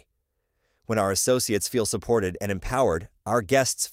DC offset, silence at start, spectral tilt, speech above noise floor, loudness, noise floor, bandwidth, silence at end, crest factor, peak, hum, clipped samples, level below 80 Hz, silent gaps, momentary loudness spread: under 0.1%; 0.9 s; -3.5 dB/octave; 52 dB; -24 LUFS; -76 dBFS; 16 kHz; 0 s; 18 dB; -8 dBFS; none; under 0.1%; -46 dBFS; none; 7 LU